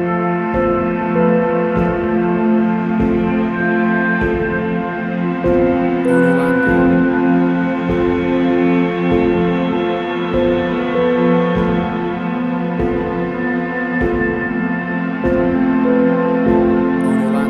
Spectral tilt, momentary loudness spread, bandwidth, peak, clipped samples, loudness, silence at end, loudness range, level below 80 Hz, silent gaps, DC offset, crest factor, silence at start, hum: -8.5 dB/octave; 5 LU; 9.8 kHz; -2 dBFS; under 0.1%; -16 LUFS; 0 s; 3 LU; -36 dBFS; none; under 0.1%; 14 dB; 0 s; none